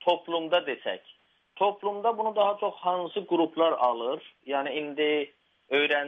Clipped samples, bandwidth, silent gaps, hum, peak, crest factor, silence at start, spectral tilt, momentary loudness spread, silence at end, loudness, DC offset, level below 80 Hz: under 0.1%; 6 kHz; none; none; -10 dBFS; 18 dB; 0 s; -6 dB/octave; 9 LU; 0 s; -28 LUFS; under 0.1%; -82 dBFS